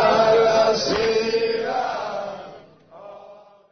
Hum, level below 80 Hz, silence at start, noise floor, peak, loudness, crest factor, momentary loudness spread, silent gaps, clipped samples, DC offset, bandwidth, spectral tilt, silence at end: none; -54 dBFS; 0 s; -46 dBFS; -6 dBFS; -20 LUFS; 14 dB; 23 LU; none; under 0.1%; under 0.1%; 6.6 kHz; -3.5 dB/octave; 0.4 s